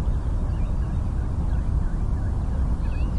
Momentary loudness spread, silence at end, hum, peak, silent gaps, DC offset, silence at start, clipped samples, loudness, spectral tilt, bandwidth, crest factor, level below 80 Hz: 1 LU; 0 s; none; -12 dBFS; none; under 0.1%; 0 s; under 0.1%; -27 LUFS; -9 dB/octave; 9.6 kHz; 10 dB; -24 dBFS